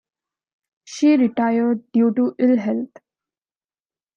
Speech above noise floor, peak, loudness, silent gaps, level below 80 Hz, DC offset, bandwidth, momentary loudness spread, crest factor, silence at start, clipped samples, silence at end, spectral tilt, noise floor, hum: over 72 dB; -6 dBFS; -19 LUFS; none; -72 dBFS; under 0.1%; 7.4 kHz; 10 LU; 14 dB; 0.9 s; under 0.1%; 1.3 s; -6.5 dB/octave; under -90 dBFS; none